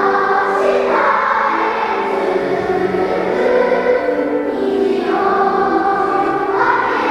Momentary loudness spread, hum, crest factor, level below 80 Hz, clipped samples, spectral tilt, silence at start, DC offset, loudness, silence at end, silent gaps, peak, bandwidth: 4 LU; none; 14 dB; -50 dBFS; under 0.1%; -6 dB/octave; 0 s; under 0.1%; -15 LUFS; 0 s; none; -2 dBFS; 10.5 kHz